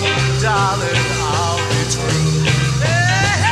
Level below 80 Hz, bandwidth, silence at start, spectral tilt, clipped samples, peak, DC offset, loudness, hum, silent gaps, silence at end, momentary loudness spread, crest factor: -34 dBFS; 13.5 kHz; 0 s; -4 dB/octave; under 0.1%; -2 dBFS; under 0.1%; -16 LUFS; none; none; 0 s; 3 LU; 14 dB